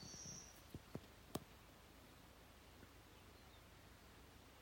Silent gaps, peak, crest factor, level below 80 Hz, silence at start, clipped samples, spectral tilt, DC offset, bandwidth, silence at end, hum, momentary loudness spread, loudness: none; -30 dBFS; 28 dB; -70 dBFS; 0 s; under 0.1%; -3.5 dB/octave; under 0.1%; 16.5 kHz; 0 s; none; 10 LU; -59 LUFS